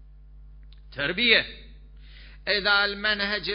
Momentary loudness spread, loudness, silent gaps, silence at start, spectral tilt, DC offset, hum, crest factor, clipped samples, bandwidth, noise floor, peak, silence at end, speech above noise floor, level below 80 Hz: 17 LU; -22 LUFS; none; 0 s; -7.5 dB/octave; under 0.1%; none; 22 dB; under 0.1%; 5.4 kHz; -47 dBFS; -4 dBFS; 0 s; 23 dB; -48 dBFS